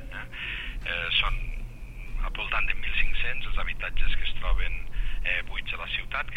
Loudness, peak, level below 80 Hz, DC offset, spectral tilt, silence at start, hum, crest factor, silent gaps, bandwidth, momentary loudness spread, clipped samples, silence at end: -30 LUFS; -10 dBFS; -30 dBFS; under 0.1%; -4 dB/octave; 0 s; none; 16 dB; none; 4.1 kHz; 12 LU; under 0.1%; 0 s